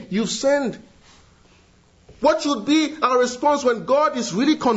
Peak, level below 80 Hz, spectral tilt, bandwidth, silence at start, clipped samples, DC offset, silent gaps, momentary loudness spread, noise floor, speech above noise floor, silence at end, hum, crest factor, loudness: -4 dBFS; -58 dBFS; -4 dB/octave; 8 kHz; 0 s; under 0.1%; under 0.1%; none; 4 LU; -55 dBFS; 35 dB; 0 s; none; 16 dB; -20 LUFS